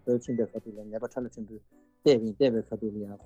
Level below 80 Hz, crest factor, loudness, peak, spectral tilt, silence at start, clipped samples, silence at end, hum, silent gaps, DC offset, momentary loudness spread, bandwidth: -64 dBFS; 18 dB; -29 LUFS; -12 dBFS; -6.5 dB/octave; 0.05 s; under 0.1%; 0 s; none; none; under 0.1%; 16 LU; 8.2 kHz